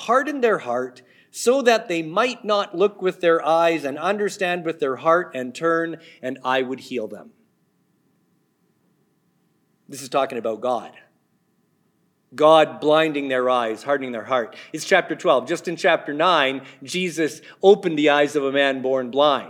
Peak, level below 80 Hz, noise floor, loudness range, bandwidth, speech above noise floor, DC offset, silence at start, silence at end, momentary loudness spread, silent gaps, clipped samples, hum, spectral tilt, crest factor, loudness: -2 dBFS; -88 dBFS; -66 dBFS; 11 LU; 17 kHz; 45 dB; under 0.1%; 0 s; 0 s; 12 LU; none; under 0.1%; none; -4 dB/octave; 20 dB; -21 LUFS